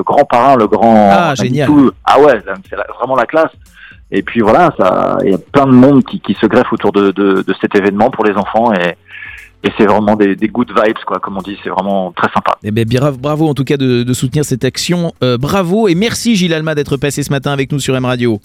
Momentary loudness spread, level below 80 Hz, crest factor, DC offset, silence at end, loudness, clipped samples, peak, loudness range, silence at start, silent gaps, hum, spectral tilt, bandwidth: 10 LU; -42 dBFS; 12 dB; under 0.1%; 0.05 s; -11 LUFS; 0.2%; 0 dBFS; 4 LU; 0 s; none; none; -6 dB/octave; 16 kHz